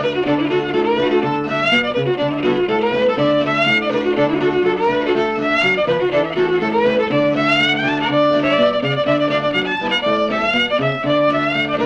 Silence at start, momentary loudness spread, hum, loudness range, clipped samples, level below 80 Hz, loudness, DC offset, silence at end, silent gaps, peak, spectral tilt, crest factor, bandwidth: 0 s; 3 LU; none; 1 LU; under 0.1%; -48 dBFS; -16 LUFS; under 0.1%; 0 s; none; -4 dBFS; -6 dB/octave; 12 dB; 8.8 kHz